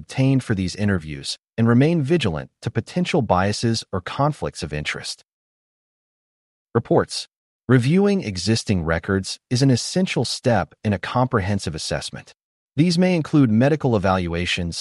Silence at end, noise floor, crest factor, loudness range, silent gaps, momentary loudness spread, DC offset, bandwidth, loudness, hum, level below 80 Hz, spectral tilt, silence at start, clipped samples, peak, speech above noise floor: 0 s; under -90 dBFS; 18 dB; 5 LU; 5.33-6.66 s, 7.36-7.60 s, 12.44-12.68 s; 11 LU; under 0.1%; 11.5 kHz; -21 LUFS; none; -46 dBFS; -6 dB/octave; 0 s; under 0.1%; -4 dBFS; over 70 dB